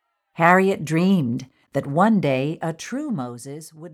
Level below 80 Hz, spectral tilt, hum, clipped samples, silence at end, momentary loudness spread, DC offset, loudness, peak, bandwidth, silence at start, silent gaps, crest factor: -64 dBFS; -6.5 dB/octave; none; under 0.1%; 0 s; 17 LU; under 0.1%; -21 LUFS; -2 dBFS; 14.5 kHz; 0.4 s; none; 20 dB